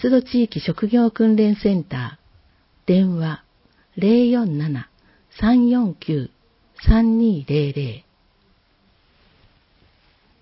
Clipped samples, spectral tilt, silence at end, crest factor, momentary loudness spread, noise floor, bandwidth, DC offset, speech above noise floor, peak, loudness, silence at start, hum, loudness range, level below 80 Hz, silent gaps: under 0.1%; -12 dB/octave; 2.4 s; 20 dB; 14 LU; -60 dBFS; 5.8 kHz; under 0.1%; 42 dB; 0 dBFS; -19 LUFS; 0 s; none; 3 LU; -34 dBFS; none